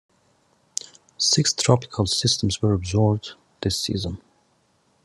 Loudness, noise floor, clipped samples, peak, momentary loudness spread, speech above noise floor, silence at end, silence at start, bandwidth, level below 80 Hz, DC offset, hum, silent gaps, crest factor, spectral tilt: -22 LUFS; -64 dBFS; under 0.1%; -2 dBFS; 14 LU; 43 dB; 0.85 s; 1.2 s; 12.5 kHz; -56 dBFS; under 0.1%; none; none; 22 dB; -4 dB/octave